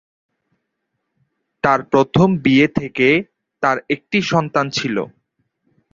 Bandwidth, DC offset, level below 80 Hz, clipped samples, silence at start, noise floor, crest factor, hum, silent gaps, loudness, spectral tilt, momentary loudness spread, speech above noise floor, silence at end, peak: 7.6 kHz; under 0.1%; -52 dBFS; under 0.1%; 1.65 s; -75 dBFS; 18 dB; none; none; -17 LUFS; -6 dB/octave; 8 LU; 59 dB; 0.85 s; 0 dBFS